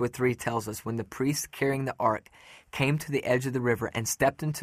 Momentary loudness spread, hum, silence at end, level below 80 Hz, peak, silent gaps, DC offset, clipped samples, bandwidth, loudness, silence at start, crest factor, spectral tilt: 7 LU; none; 0 s; -58 dBFS; -10 dBFS; none; under 0.1%; under 0.1%; 15.5 kHz; -29 LUFS; 0 s; 18 dB; -5 dB/octave